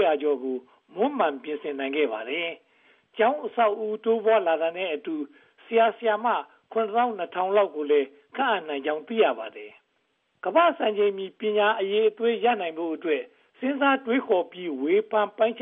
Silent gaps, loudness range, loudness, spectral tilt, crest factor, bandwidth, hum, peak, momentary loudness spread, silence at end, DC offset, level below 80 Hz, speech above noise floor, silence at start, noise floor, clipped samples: none; 2 LU; -25 LUFS; -1.5 dB/octave; 16 dB; 3.9 kHz; none; -8 dBFS; 11 LU; 0 s; under 0.1%; -90 dBFS; 47 dB; 0 s; -72 dBFS; under 0.1%